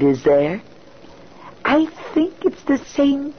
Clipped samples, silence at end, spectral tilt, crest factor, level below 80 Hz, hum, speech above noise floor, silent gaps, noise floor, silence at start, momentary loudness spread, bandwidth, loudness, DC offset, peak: under 0.1%; 0.05 s; -6.5 dB/octave; 14 dB; -52 dBFS; none; 26 dB; none; -44 dBFS; 0 s; 7 LU; 6.6 kHz; -19 LUFS; 0.4%; -6 dBFS